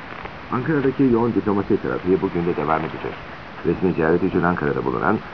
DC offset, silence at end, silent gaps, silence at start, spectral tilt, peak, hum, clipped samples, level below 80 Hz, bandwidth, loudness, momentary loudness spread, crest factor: 0.5%; 0 s; none; 0 s; -9.5 dB/octave; -2 dBFS; none; under 0.1%; -46 dBFS; 5.4 kHz; -21 LUFS; 12 LU; 18 dB